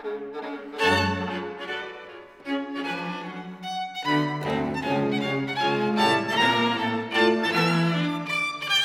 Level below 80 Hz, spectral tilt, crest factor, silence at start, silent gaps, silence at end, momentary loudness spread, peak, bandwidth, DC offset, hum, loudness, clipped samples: -60 dBFS; -5 dB/octave; 18 dB; 0 s; none; 0 s; 13 LU; -8 dBFS; 17 kHz; under 0.1%; none; -25 LUFS; under 0.1%